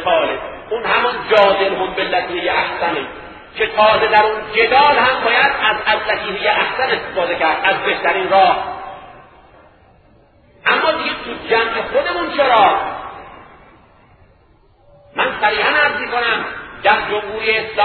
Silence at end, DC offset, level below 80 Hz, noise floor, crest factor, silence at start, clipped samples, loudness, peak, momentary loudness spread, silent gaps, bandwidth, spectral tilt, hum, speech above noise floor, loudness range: 0 s; under 0.1%; -48 dBFS; -51 dBFS; 16 dB; 0 s; under 0.1%; -15 LUFS; 0 dBFS; 13 LU; none; 6.2 kHz; -5.5 dB/octave; none; 36 dB; 6 LU